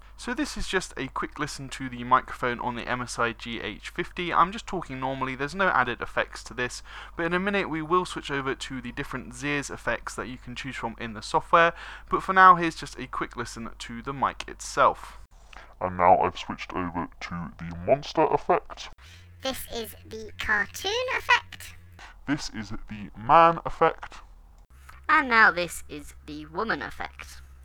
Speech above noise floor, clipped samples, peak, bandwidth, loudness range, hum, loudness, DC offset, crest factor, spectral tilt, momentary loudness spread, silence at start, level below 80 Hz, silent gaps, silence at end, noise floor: 24 dB; under 0.1%; -2 dBFS; over 20 kHz; 6 LU; none; -26 LUFS; under 0.1%; 26 dB; -4 dB/octave; 18 LU; 0.05 s; -46 dBFS; none; 0 s; -51 dBFS